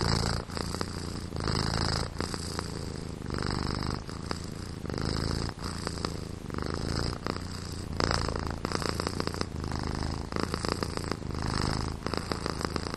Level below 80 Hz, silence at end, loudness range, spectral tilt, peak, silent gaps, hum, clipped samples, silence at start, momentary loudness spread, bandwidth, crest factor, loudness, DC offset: -40 dBFS; 0 s; 2 LU; -5 dB/octave; -6 dBFS; none; none; under 0.1%; 0 s; 7 LU; 13 kHz; 26 dB; -33 LUFS; under 0.1%